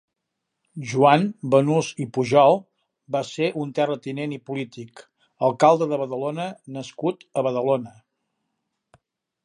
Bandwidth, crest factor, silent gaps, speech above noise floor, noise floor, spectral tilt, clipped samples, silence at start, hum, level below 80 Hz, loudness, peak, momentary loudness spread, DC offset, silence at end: 10.5 kHz; 22 dB; none; 59 dB; -81 dBFS; -6 dB/octave; under 0.1%; 0.75 s; none; -72 dBFS; -22 LUFS; -2 dBFS; 18 LU; under 0.1%; 1.55 s